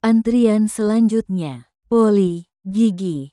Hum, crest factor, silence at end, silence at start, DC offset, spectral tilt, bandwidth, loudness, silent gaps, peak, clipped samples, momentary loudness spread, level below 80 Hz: none; 12 dB; 0.05 s; 0.05 s; under 0.1%; -7 dB/octave; 12 kHz; -18 LUFS; none; -4 dBFS; under 0.1%; 11 LU; -54 dBFS